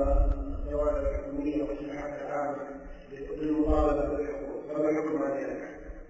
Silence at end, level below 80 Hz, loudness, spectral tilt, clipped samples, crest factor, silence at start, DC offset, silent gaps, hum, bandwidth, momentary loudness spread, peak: 0 s; -36 dBFS; -31 LUFS; -8.5 dB/octave; under 0.1%; 18 dB; 0 s; under 0.1%; none; none; 7.8 kHz; 13 LU; -12 dBFS